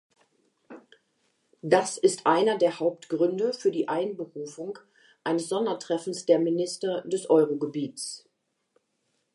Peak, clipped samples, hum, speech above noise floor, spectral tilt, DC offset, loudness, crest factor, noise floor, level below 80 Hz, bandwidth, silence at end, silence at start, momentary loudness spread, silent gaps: -6 dBFS; under 0.1%; none; 49 dB; -4.5 dB/octave; under 0.1%; -26 LUFS; 22 dB; -75 dBFS; -84 dBFS; 11.5 kHz; 1.15 s; 0.7 s; 14 LU; none